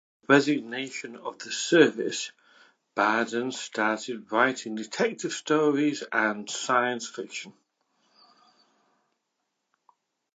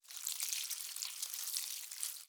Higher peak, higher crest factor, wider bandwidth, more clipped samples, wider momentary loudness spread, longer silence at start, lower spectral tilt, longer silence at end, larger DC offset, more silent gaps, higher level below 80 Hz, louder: first, -4 dBFS vs -18 dBFS; about the same, 24 dB vs 26 dB; second, 9.2 kHz vs over 20 kHz; neither; first, 15 LU vs 4 LU; first, 0.3 s vs 0.05 s; first, -3.5 dB/octave vs 7.5 dB/octave; first, 2.85 s vs 0 s; neither; neither; first, -84 dBFS vs under -90 dBFS; first, -26 LUFS vs -39 LUFS